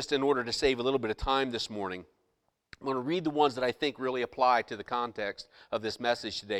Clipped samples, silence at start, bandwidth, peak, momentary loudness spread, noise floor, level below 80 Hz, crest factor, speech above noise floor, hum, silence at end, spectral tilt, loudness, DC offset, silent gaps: under 0.1%; 0 s; 12.5 kHz; -10 dBFS; 10 LU; -77 dBFS; -54 dBFS; 20 dB; 47 dB; none; 0 s; -4 dB/octave; -31 LUFS; under 0.1%; none